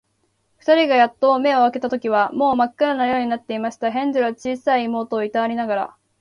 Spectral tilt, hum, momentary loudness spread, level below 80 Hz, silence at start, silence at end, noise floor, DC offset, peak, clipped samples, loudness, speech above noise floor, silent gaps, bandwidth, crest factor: -5 dB/octave; none; 8 LU; -62 dBFS; 0.65 s; 0.35 s; -67 dBFS; under 0.1%; -4 dBFS; under 0.1%; -19 LUFS; 48 dB; none; 10.5 kHz; 16 dB